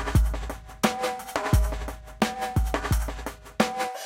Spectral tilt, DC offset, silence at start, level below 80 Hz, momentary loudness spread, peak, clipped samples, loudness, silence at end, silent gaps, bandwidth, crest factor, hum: -5 dB/octave; under 0.1%; 0 s; -30 dBFS; 11 LU; -6 dBFS; under 0.1%; -28 LUFS; 0 s; none; 17 kHz; 20 dB; none